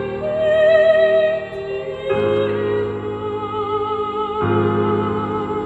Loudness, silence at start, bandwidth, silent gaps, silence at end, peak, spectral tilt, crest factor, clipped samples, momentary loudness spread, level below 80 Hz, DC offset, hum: -19 LUFS; 0 s; 8 kHz; none; 0 s; -4 dBFS; -8 dB/octave; 16 dB; under 0.1%; 12 LU; -50 dBFS; under 0.1%; none